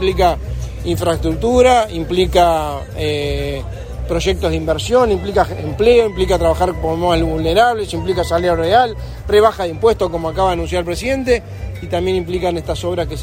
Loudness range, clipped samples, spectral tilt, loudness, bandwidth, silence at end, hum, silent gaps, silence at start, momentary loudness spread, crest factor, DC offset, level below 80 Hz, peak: 3 LU; under 0.1%; -5.5 dB/octave; -16 LUFS; 16.5 kHz; 0 s; none; none; 0 s; 9 LU; 16 dB; under 0.1%; -28 dBFS; 0 dBFS